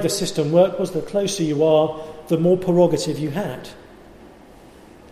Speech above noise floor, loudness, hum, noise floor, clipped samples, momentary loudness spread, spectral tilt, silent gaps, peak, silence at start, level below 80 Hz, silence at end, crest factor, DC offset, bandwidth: 26 dB; -20 LUFS; none; -45 dBFS; under 0.1%; 11 LU; -6 dB/octave; none; -4 dBFS; 0 s; -52 dBFS; 0.85 s; 16 dB; under 0.1%; 15 kHz